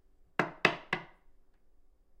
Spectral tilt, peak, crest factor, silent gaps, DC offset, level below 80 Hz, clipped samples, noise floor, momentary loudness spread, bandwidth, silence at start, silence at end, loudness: -4.5 dB/octave; -6 dBFS; 30 dB; none; under 0.1%; -64 dBFS; under 0.1%; -61 dBFS; 9 LU; 15 kHz; 0.4 s; 1.15 s; -33 LUFS